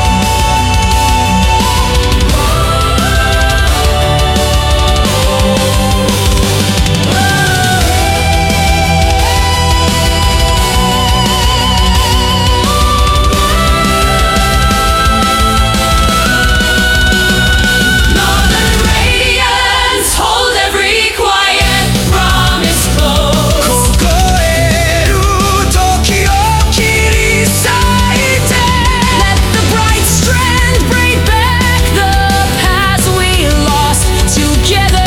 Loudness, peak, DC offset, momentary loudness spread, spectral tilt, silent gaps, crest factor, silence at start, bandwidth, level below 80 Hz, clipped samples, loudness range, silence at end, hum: -9 LUFS; 0 dBFS; under 0.1%; 2 LU; -3.5 dB/octave; none; 10 dB; 0 s; 17 kHz; -14 dBFS; under 0.1%; 1 LU; 0 s; none